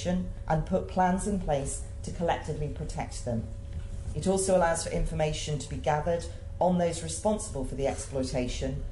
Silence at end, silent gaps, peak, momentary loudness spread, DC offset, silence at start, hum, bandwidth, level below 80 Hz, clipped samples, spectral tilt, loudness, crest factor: 0 s; none; -14 dBFS; 10 LU; under 0.1%; 0 s; none; 11.5 kHz; -38 dBFS; under 0.1%; -5.5 dB/octave; -30 LUFS; 16 dB